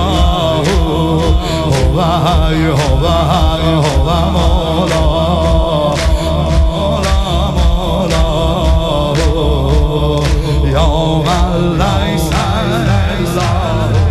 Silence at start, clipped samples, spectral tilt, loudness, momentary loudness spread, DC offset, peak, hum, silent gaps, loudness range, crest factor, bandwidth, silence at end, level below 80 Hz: 0 s; under 0.1%; -6 dB/octave; -13 LUFS; 2 LU; under 0.1%; 0 dBFS; none; none; 1 LU; 12 dB; 13.5 kHz; 0 s; -16 dBFS